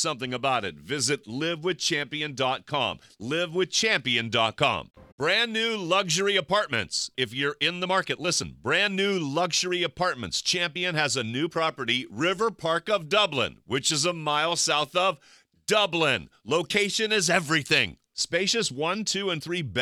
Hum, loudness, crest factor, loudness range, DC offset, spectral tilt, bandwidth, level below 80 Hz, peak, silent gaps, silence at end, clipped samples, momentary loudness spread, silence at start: none; -25 LUFS; 20 dB; 2 LU; under 0.1%; -2.5 dB/octave; 16 kHz; -62 dBFS; -6 dBFS; 5.12-5.18 s; 0 s; under 0.1%; 6 LU; 0 s